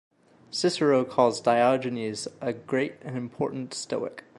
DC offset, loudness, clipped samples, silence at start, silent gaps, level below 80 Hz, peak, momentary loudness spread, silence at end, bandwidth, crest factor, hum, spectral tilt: under 0.1%; -27 LUFS; under 0.1%; 0.5 s; none; -70 dBFS; -8 dBFS; 12 LU; 0.2 s; 11.5 kHz; 20 dB; none; -5 dB/octave